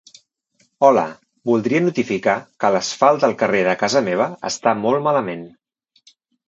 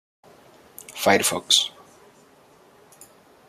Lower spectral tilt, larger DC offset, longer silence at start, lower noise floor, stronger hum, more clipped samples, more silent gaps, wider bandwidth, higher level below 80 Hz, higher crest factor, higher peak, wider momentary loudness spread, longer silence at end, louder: first, -5 dB/octave vs -1.5 dB/octave; neither; about the same, 0.8 s vs 0.9 s; first, -63 dBFS vs -54 dBFS; neither; neither; neither; second, 8.2 kHz vs 15.5 kHz; about the same, -64 dBFS vs -68 dBFS; second, 18 dB vs 26 dB; about the same, 0 dBFS vs -2 dBFS; second, 6 LU vs 20 LU; second, 1 s vs 1.8 s; about the same, -18 LUFS vs -20 LUFS